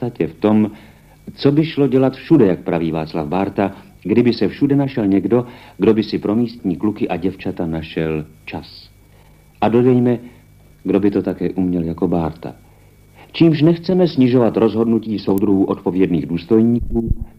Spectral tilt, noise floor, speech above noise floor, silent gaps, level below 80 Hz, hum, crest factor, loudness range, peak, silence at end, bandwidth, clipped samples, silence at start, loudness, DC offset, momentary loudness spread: -9 dB/octave; -47 dBFS; 31 dB; none; -38 dBFS; none; 16 dB; 5 LU; 0 dBFS; 0.1 s; 15.5 kHz; under 0.1%; 0 s; -17 LUFS; under 0.1%; 10 LU